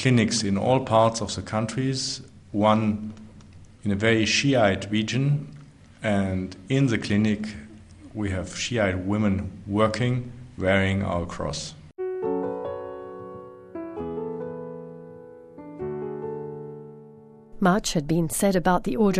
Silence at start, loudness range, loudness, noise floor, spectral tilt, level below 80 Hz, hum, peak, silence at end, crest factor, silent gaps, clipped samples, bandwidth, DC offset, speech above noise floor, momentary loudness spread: 0 s; 11 LU; -25 LUFS; -48 dBFS; -5.5 dB/octave; -48 dBFS; none; -6 dBFS; 0 s; 18 dB; none; under 0.1%; 13.5 kHz; under 0.1%; 25 dB; 19 LU